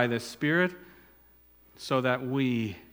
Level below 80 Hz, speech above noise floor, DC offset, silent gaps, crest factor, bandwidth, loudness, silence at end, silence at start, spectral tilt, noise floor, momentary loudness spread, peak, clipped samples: -66 dBFS; 31 dB; under 0.1%; none; 22 dB; 18 kHz; -28 LUFS; 0.1 s; 0 s; -6 dB/octave; -59 dBFS; 9 LU; -8 dBFS; under 0.1%